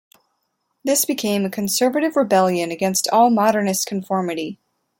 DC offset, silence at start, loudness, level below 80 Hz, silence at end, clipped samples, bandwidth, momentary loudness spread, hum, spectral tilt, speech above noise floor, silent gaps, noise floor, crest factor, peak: under 0.1%; 0.85 s; -19 LUFS; -66 dBFS; 0.45 s; under 0.1%; 17 kHz; 8 LU; none; -4 dB/octave; 53 dB; none; -72 dBFS; 16 dB; -4 dBFS